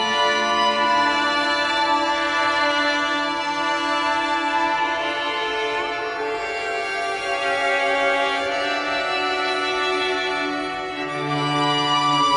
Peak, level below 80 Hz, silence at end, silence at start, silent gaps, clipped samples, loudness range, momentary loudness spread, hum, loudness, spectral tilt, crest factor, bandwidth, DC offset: -8 dBFS; -56 dBFS; 0 s; 0 s; none; under 0.1%; 3 LU; 6 LU; none; -21 LUFS; -3 dB/octave; 14 dB; 11.5 kHz; under 0.1%